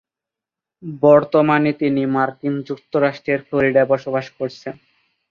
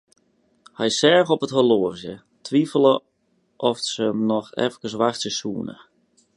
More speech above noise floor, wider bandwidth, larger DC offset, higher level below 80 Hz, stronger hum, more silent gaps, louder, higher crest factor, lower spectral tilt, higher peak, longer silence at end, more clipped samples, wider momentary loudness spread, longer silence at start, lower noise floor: first, 69 dB vs 46 dB; second, 7 kHz vs 11.5 kHz; neither; first, -60 dBFS vs -66 dBFS; neither; neither; first, -18 LUFS vs -21 LUFS; about the same, 18 dB vs 20 dB; first, -8 dB/octave vs -4.5 dB/octave; about the same, -2 dBFS vs -2 dBFS; about the same, 0.6 s vs 0.65 s; neither; about the same, 14 LU vs 13 LU; about the same, 0.85 s vs 0.8 s; first, -87 dBFS vs -67 dBFS